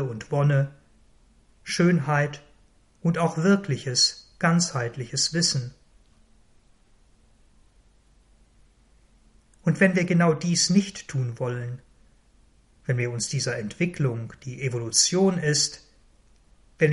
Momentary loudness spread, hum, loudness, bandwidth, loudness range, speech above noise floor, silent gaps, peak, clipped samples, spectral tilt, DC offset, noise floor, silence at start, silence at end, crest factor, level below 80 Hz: 12 LU; none; -24 LUFS; 11.5 kHz; 6 LU; 35 dB; none; -6 dBFS; under 0.1%; -4 dB/octave; under 0.1%; -59 dBFS; 0 s; 0 s; 20 dB; -58 dBFS